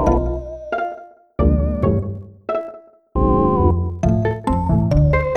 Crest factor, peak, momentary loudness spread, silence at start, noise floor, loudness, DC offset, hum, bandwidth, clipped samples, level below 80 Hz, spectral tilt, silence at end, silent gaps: 16 dB; -2 dBFS; 13 LU; 0 s; -38 dBFS; -19 LUFS; under 0.1%; none; 8.8 kHz; under 0.1%; -24 dBFS; -9.5 dB/octave; 0 s; none